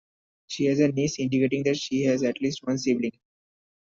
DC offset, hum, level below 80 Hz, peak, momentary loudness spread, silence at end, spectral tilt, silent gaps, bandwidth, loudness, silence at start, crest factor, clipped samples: under 0.1%; none; -64 dBFS; -10 dBFS; 5 LU; 0.8 s; -5.5 dB/octave; none; 7.6 kHz; -25 LUFS; 0.5 s; 16 dB; under 0.1%